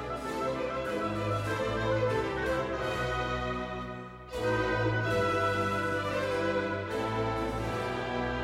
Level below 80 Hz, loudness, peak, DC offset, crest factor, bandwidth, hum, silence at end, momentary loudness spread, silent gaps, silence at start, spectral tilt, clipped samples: -48 dBFS; -31 LUFS; -18 dBFS; under 0.1%; 14 dB; 15.5 kHz; none; 0 s; 6 LU; none; 0 s; -6 dB/octave; under 0.1%